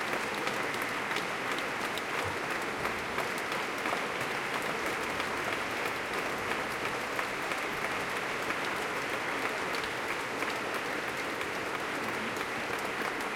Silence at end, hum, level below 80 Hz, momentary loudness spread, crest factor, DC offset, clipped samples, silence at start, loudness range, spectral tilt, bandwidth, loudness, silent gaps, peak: 0 s; none; -64 dBFS; 1 LU; 18 dB; under 0.1%; under 0.1%; 0 s; 1 LU; -3 dB/octave; 17 kHz; -33 LUFS; none; -16 dBFS